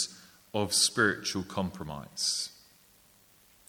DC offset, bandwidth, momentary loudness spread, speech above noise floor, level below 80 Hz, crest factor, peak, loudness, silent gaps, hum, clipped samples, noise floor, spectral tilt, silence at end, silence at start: under 0.1%; over 20 kHz; 14 LU; 31 dB; -62 dBFS; 22 dB; -10 dBFS; -29 LUFS; none; none; under 0.1%; -62 dBFS; -2 dB/octave; 1.15 s; 0 s